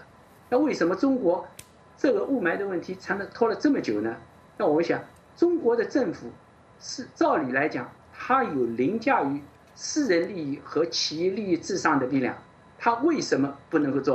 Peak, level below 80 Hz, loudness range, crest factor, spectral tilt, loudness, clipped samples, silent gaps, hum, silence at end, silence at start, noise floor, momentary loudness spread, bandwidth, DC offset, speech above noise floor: -8 dBFS; -68 dBFS; 1 LU; 18 dB; -4.5 dB/octave; -26 LUFS; under 0.1%; none; none; 0 s; 0 s; -53 dBFS; 12 LU; 10 kHz; under 0.1%; 27 dB